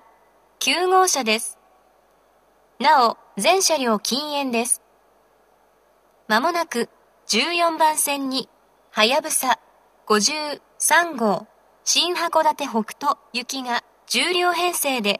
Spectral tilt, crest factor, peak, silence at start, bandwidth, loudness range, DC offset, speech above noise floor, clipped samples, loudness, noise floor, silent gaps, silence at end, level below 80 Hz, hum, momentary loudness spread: -1.5 dB/octave; 22 dB; -2 dBFS; 0.6 s; 14.5 kHz; 3 LU; under 0.1%; 38 dB; under 0.1%; -20 LUFS; -59 dBFS; none; 0 s; -76 dBFS; none; 9 LU